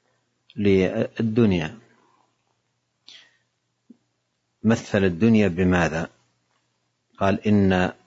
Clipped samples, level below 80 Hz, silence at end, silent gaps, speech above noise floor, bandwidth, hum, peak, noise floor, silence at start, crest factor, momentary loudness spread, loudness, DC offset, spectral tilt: under 0.1%; -56 dBFS; 0.15 s; none; 54 dB; 7.8 kHz; none; -4 dBFS; -74 dBFS; 0.55 s; 18 dB; 8 LU; -21 LUFS; under 0.1%; -7 dB/octave